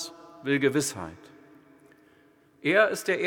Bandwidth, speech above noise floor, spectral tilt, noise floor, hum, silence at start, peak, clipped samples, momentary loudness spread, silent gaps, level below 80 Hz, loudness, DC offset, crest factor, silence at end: 19 kHz; 35 dB; -4 dB/octave; -60 dBFS; none; 0 s; -6 dBFS; under 0.1%; 17 LU; none; -72 dBFS; -25 LUFS; under 0.1%; 22 dB; 0 s